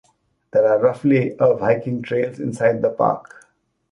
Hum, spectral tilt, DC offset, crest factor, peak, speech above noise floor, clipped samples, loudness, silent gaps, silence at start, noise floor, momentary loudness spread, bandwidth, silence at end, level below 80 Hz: none; -8 dB/octave; under 0.1%; 16 dB; -4 dBFS; 41 dB; under 0.1%; -19 LUFS; none; 0.55 s; -59 dBFS; 7 LU; 11 kHz; 0.7 s; -60 dBFS